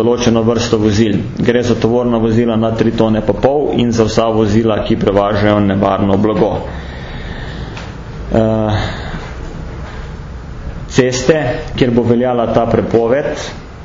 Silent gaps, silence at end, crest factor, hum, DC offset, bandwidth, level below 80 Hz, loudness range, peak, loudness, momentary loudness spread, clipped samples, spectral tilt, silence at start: none; 0 s; 14 dB; none; under 0.1%; 7.6 kHz; -30 dBFS; 7 LU; 0 dBFS; -13 LUFS; 15 LU; under 0.1%; -6.5 dB/octave; 0 s